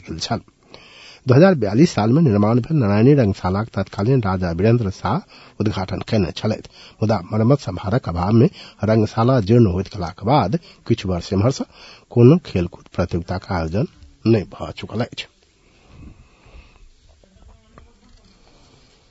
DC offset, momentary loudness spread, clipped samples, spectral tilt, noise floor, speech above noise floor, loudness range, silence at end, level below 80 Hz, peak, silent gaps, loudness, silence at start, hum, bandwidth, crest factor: under 0.1%; 12 LU; under 0.1%; -8 dB/octave; -55 dBFS; 37 dB; 9 LU; 3 s; -48 dBFS; 0 dBFS; none; -19 LUFS; 0.05 s; none; 8 kHz; 20 dB